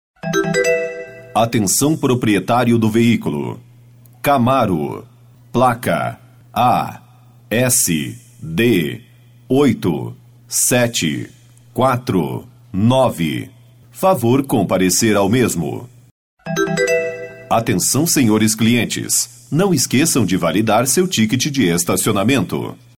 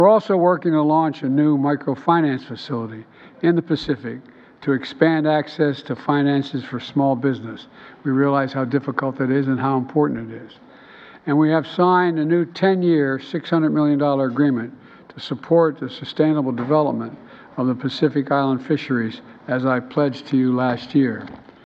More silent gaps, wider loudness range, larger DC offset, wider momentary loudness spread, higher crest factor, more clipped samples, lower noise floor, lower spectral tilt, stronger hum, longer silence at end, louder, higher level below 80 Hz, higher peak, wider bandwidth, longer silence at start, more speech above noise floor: first, 16.11-16.37 s vs none; about the same, 3 LU vs 3 LU; neither; about the same, 12 LU vs 12 LU; about the same, 14 dB vs 18 dB; neither; about the same, -44 dBFS vs -44 dBFS; second, -4.5 dB/octave vs -8.5 dB/octave; neither; about the same, 0.2 s vs 0.3 s; first, -16 LUFS vs -20 LUFS; first, -50 dBFS vs -62 dBFS; about the same, -4 dBFS vs -2 dBFS; first, 18.5 kHz vs 7 kHz; first, 0.25 s vs 0 s; first, 29 dB vs 25 dB